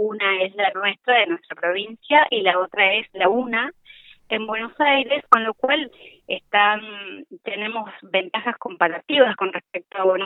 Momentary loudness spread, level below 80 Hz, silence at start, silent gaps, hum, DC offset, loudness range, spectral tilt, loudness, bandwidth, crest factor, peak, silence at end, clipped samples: 13 LU; -70 dBFS; 0 s; none; none; under 0.1%; 4 LU; -5 dB/octave; -20 LUFS; 6.8 kHz; 22 dB; 0 dBFS; 0 s; under 0.1%